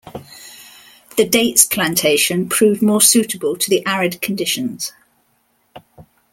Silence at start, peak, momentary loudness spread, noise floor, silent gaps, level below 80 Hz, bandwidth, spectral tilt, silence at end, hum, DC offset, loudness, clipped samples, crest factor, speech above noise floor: 0.05 s; 0 dBFS; 19 LU; -62 dBFS; none; -58 dBFS; 17 kHz; -2.5 dB/octave; 0.3 s; none; under 0.1%; -15 LUFS; under 0.1%; 18 dB; 46 dB